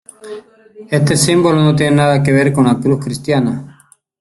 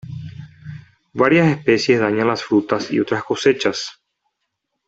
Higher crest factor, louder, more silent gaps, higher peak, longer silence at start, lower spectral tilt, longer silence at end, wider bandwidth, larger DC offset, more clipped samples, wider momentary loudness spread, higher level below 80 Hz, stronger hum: about the same, 14 dB vs 18 dB; first, -13 LUFS vs -17 LUFS; neither; about the same, 0 dBFS vs -2 dBFS; first, 0.25 s vs 0.05 s; about the same, -5.5 dB/octave vs -5.5 dB/octave; second, 0.55 s vs 0.95 s; first, 12.5 kHz vs 8 kHz; neither; neither; about the same, 19 LU vs 21 LU; first, -46 dBFS vs -58 dBFS; neither